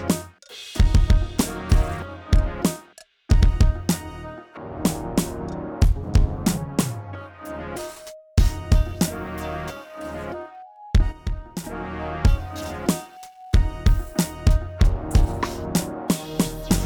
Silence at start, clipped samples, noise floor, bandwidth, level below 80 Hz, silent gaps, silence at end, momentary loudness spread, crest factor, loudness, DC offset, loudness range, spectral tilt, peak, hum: 0 s; under 0.1%; -50 dBFS; 19 kHz; -24 dBFS; none; 0 s; 15 LU; 16 dB; -24 LUFS; under 0.1%; 4 LU; -5.5 dB/octave; -4 dBFS; none